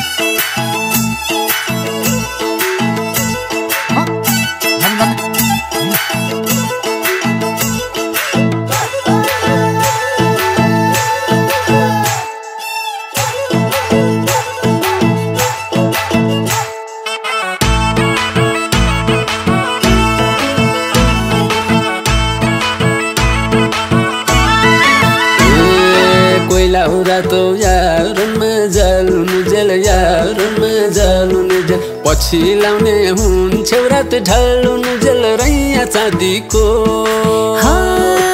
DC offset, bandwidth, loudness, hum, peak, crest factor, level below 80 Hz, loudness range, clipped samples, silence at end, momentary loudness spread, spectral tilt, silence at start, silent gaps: under 0.1%; 16.5 kHz; -12 LUFS; none; 0 dBFS; 12 dB; -24 dBFS; 5 LU; under 0.1%; 0 s; 5 LU; -4.5 dB/octave; 0 s; none